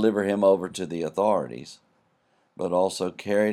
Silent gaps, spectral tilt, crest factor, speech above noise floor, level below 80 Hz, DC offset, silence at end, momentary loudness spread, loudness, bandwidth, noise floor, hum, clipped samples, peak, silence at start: none; -5.5 dB/octave; 18 dB; 43 dB; -70 dBFS; under 0.1%; 0 s; 13 LU; -25 LUFS; 13 kHz; -67 dBFS; none; under 0.1%; -8 dBFS; 0 s